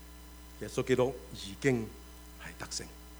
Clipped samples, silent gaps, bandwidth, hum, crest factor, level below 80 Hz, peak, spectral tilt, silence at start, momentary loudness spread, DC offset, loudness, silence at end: under 0.1%; none; over 20 kHz; none; 22 dB; -52 dBFS; -14 dBFS; -5 dB/octave; 0 s; 21 LU; under 0.1%; -34 LUFS; 0 s